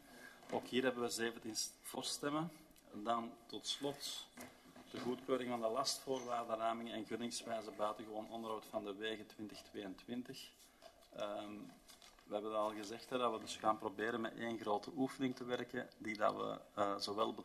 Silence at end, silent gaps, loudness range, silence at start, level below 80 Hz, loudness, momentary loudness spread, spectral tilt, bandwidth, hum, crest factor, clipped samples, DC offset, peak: 0 s; none; 7 LU; 0 s; -78 dBFS; -43 LUFS; 15 LU; -3.5 dB/octave; 13.5 kHz; none; 22 dB; under 0.1%; under 0.1%; -20 dBFS